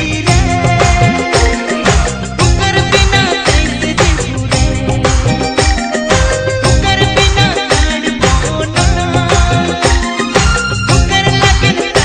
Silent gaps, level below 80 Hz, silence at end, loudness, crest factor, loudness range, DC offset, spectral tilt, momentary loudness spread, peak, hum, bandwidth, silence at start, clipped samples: none; -16 dBFS; 0 s; -11 LUFS; 10 dB; 1 LU; under 0.1%; -4 dB/octave; 4 LU; 0 dBFS; none; 10 kHz; 0 s; 0.3%